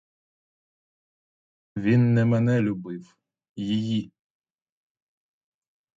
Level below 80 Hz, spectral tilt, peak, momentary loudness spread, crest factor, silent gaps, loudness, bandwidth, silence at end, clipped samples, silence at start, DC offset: -62 dBFS; -8.5 dB/octave; -10 dBFS; 19 LU; 18 dB; 3.49-3.56 s; -24 LUFS; 7.6 kHz; 1.9 s; under 0.1%; 1.75 s; under 0.1%